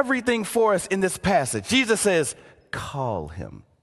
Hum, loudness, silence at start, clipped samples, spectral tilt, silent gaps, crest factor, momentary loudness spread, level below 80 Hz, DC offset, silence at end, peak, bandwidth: none; -23 LUFS; 0 s; under 0.1%; -4 dB/octave; none; 18 dB; 16 LU; -48 dBFS; under 0.1%; 0.25 s; -6 dBFS; 12.5 kHz